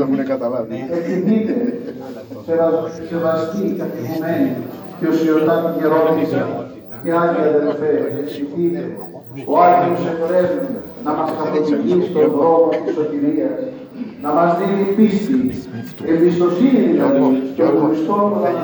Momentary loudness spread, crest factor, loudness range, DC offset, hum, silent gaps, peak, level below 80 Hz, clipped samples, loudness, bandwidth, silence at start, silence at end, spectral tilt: 13 LU; 16 dB; 4 LU; under 0.1%; none; none; 0 dBFS; -60 dBFS; under 0.1%; -17 LUFS; over 20 kHz; 0 s; 0 s; -8.5 dB/octave